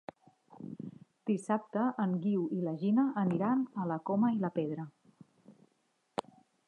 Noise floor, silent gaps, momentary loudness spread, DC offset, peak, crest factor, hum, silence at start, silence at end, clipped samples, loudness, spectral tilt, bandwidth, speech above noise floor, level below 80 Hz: -76 dBFS; none; 17 LU; under 0.1%; -16 dBFS; 18 dB; none; 0.5 s; 1.15 s; under 0.1%; -33 LUFS; -8.5 dB/octave; 10.5 kHz; 44 dB; -82 dBFS